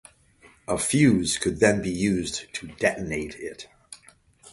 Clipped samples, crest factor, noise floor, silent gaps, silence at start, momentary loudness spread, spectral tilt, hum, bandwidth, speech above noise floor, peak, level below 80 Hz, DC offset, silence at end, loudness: under 0.1%; 22 dB; -56 dBFS; none; 0.7 s; 23 LU; -4.5 dB/octave; none; 11.5 kHz; 32 dB; -4 dBFS; -50 dBFS; under 0.1%; 0.05 s; -24 LUFS